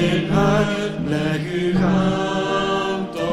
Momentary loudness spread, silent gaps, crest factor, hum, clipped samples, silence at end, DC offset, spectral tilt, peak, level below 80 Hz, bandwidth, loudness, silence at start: 5 LU; none; 14 dB; none; under 0.1%; 0 s; under 0.1%; -6.5 dB/octave; -4 dBFS; -40 dBFS; 12 kHz; -20 LUFS; 0 s